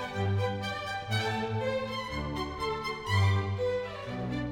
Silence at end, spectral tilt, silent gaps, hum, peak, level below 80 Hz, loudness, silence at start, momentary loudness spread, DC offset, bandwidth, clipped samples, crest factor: 0 s; -6 dB/octave; none; none; -16 dBFS; -50 dBFS; -32 LUFS; 0 s; 7 LU; under 0.1%; 13.5 kHz; under 0.1%; 16 dB